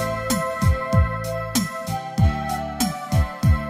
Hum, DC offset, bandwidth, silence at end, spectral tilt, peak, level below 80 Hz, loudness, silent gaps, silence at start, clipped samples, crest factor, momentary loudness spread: none; under 0.1%; 16 kHz; 0 s; -5.5 dB/octave; -6 dBFS; -28 dBFS; -23 LUFS; none; 0 s; under 0.1%; 16 dB; 6 LU